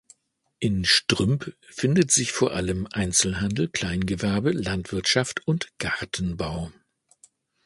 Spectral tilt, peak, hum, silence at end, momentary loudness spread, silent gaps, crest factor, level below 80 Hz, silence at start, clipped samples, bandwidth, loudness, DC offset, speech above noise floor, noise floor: -3.5 dB/octave; -4 dBFS; none; 0.95 s; 10 LU; none; 22 dB; -44 dBFS; 0.6 s; under 0.1%; 11.5 kHz; -24 LUFS; under 0.1%; 35 dB; -60 dBFS